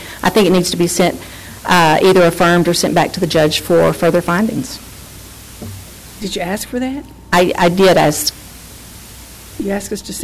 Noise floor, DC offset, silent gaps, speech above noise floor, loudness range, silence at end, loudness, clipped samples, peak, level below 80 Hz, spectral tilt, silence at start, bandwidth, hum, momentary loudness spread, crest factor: -35 dBFS; under 0.1%; none; 22 dB; 7 LU; 0 s; -14 LUFS; under 0.1%; -4 dBFS; -40 dBFS; -4.5 dB/octave; 0 s; 16 kHz; none; 23 LU; 12 dB